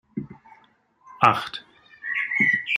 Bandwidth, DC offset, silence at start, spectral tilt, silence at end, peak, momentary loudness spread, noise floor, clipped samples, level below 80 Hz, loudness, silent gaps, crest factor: 16 kHz; under 0.1%; 0.15 s; -5 dB/octave; 0 s; -2 dBFS; 17 LU; -60 dBFS; under 0.1%; -66 dBFS; -21 LUFS; none; 24 dB